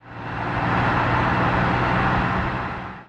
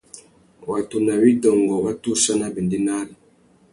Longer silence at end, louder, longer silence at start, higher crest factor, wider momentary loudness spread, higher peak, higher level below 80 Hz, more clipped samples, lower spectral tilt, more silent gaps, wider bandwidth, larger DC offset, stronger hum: second, 0.05 s vs 0.6 s; about the same, -21 LUFS vs -20 LUFS; about the same, 0.05 s vs 0.15 s; about the same, 14 dB vs 18 dB; second, 8 LU vs 12 LU; second, -8 dBFS vs -2 dBFS; first, -36 dBFS vs -58 dBFS; neither; first, -7.5 dB/octave vs -4.5 dB/octave; neither; second, 8.2 kHz vs 11.5 kHz; neither; neither